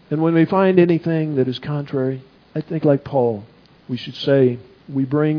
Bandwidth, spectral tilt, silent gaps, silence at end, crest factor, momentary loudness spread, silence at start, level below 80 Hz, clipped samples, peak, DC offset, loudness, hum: 5.4 kHz; -9.5 dB/octave; none; 0 s; 18 dB; 15 LU; 0.1 s; -60 dBFS; under 0.1%; -2 dBFS; under 0.1%; -19 LUFS; none